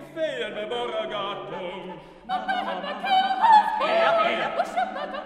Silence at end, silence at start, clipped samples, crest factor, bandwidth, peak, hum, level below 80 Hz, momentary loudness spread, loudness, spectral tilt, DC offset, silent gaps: 0 s; 0 s; under 0.1%; 20 dB; 12 kHz; -6 dBFS; none; -62 dBFS; 16 LU; -24 LUFS; -4 dB/octave; under 0.1%; none